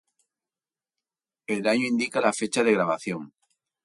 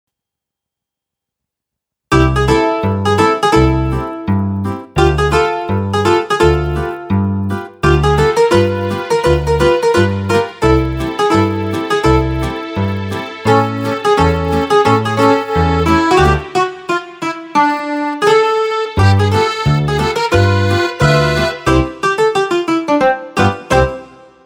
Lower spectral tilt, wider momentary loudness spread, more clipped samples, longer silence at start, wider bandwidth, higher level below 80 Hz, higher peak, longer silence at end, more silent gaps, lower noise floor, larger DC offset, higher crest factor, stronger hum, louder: second, -4 dB/octave vs -6 dB/octave; first, 11 LU vs 7 LU; neither; second, 1.5 s vs 2.1 s; second, 11.5 kHz vs 16 kHz; second, -72 dBFS vs -26 dBFS; second, -8 dBFS vs 0 dBFS; first, 0.55 s vs 0.4 s; neither; first, under -90 dBFS vs -83 dBFS; neither; first, 20 dB vs 14 dB; neither; second, -25 LUFS vs -14 LUFS